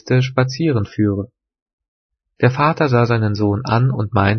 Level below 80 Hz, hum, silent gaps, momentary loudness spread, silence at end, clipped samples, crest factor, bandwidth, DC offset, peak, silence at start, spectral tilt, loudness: -50 dBFS; none; 1.62-1.66 s, 1.73-1.78 s, 1.88-2.09 s; 4 LU; 0 s; under 0.1%; 16 dB; 6.4 kHz; under 0.1%; 0 dBFS; 0.05 s; -7.5 dB/octave; -17 LUFS